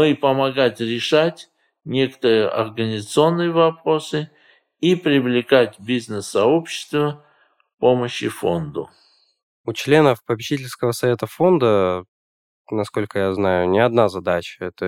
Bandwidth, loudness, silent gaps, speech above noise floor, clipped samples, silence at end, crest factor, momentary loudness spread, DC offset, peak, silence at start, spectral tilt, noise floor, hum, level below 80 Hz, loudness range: 16 kHz; -19 LUFS; 9.43-9.64 s, 12.08-12.65 s; over 71 dB; under 0.1%; 0 s; 20 dB; 10 LU; under 0.1%; 0 dBFS; 0 s; -5.5 dB/octave; under -90 dBFS; none; -60 dBFS; 2 LU